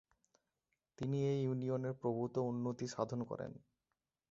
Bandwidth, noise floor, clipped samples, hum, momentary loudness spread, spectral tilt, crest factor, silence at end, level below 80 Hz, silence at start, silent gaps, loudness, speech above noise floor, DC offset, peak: 7.6 kHz; under -90 dBFS; under 0.1%; none; 9 LU; -8 dB/octave; 18 dB; 0.75 s; -74 dBFS; 1 s; none; -40 LUFS; over 51 dB; under 0.1%; -22 dBFS